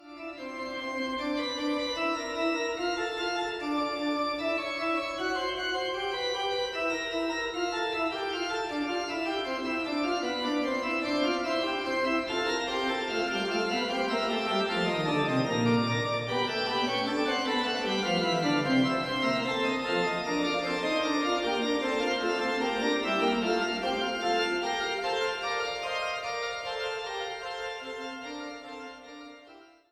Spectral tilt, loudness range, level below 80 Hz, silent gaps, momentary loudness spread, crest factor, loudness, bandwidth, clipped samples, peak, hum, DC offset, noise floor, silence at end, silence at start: -4.5 dB/octave; 4 LU; -62 dBFS; none; 7 LU; 16 dB; -29 LUFS; 15 kHz; under 0.1%; -14 dBFS; none; under 0.1%; -54 dBFS; 0.25 s; 0 s